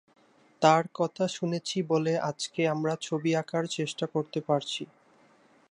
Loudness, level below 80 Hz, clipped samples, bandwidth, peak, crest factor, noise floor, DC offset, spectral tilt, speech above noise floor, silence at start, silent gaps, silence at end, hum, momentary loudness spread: -29 LUFS; -78 dBFS; under 0.1%; 11 kHz; -6 dBFS; 22 dB; -61 dBFS; under 0.1%; -5 dB/octave; 33 dB; 0.6 s; none; 0.85 s; none; 8 LU